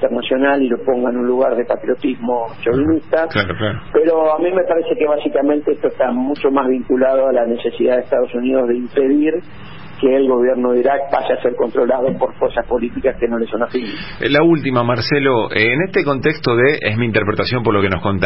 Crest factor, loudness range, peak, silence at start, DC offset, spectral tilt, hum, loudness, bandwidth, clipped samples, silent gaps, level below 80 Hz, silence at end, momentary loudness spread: 14 dB; 2 LU; -2 dBFS; 0 s; 2%; -10.5 dB/octave; none; -16 LUFS; 5.8 kHz; under 0.1%; none; -42 dBFS; 0 s; 6 LU